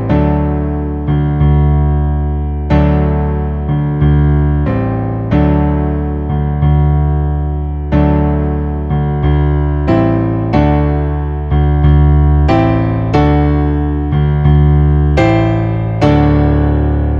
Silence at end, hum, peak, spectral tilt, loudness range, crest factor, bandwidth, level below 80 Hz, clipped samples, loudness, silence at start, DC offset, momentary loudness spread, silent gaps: 0 s; none; 0 dBFS; -10 dB/octave; 2 LU; 12 dB; 5.4 kHz; -16 dBFS; under 0.1%; -13 LUFS; 0 s; under 0.1%; 6 LU; none